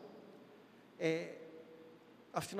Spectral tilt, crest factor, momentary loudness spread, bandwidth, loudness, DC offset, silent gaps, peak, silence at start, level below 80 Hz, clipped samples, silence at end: -5 dB/octave; 24 dB; 23 LU; 15.5 kHz; -41 LUFS; under 0.1%; none; -20 dBFS; 0 s; -84 dBFS; under 0.1%; 0 s